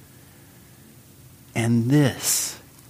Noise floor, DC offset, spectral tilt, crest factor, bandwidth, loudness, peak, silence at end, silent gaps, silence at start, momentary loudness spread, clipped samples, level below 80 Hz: -49 dBFS; under 0.1%; -4.5 dB/octave; 18 dB; 15.5 kHz; -22 LUFS; -6 dBFS; 0.3 s; none; 1.55 s; 10 LU; under 0.1%; -60 dBFS